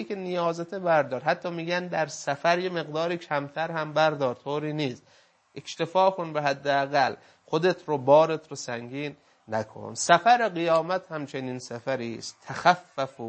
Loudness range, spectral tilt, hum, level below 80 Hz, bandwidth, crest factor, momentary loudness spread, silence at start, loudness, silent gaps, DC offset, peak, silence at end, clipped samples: 3 LU; -4.5 dB/octave; none; -76 dBFS; 8.8 kHz; 24 dB; 14 LU; 0 s; -26 LUFS; none; under 0.1%; -4 dBFS; 0 s; under 0.1%